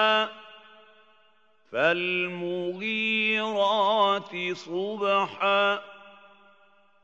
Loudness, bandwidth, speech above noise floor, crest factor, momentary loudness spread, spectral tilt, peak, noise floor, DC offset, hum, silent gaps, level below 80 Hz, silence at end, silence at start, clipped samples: -25 LUFS; 8 kHz; 39 dB; 18 dB; 9 LU; -4.5 dB/octave; -10 dBFS; -64 dBFS; under 0.1%; none; none; -86 dBFS; 0.95 s; 0 s; under 0.1%